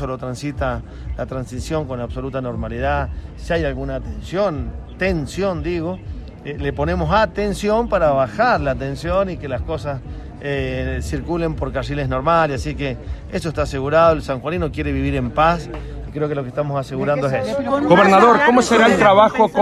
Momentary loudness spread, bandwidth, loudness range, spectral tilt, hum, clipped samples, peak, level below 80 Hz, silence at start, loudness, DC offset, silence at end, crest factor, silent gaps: 15 LU; 13 kHz; 8 LU; -6 dB/octave; none; under 0.1%; 0 dBFS; -32 dBFS; 0 s; -19 LUFS; under 0.1%; 0 s; 18 dB; none